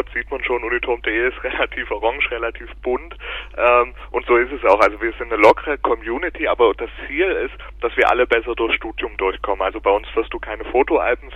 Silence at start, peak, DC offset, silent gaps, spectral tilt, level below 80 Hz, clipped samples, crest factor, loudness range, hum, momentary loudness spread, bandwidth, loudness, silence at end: 0 s; 0 dBFS; under 0.1%; none; -5.5 dB/octave; -38 dBFS; under 0.1%; 18 dB; 4 LU; 50 Hz at -40 dBFS; 11 LU; 10 kHz; -19 LUFS; 0 s